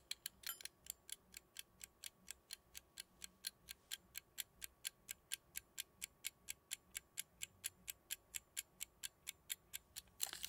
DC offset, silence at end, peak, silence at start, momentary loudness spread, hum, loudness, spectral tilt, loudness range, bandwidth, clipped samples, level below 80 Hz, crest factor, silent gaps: under 0.1%; 0 s; -20 dBFS; 0 s; 7 LU; none; -51 LUFS; 1.5 dB/octave; 4 LU; 18 kHz; under 0.1%; -78 dBFS; 34 dB; none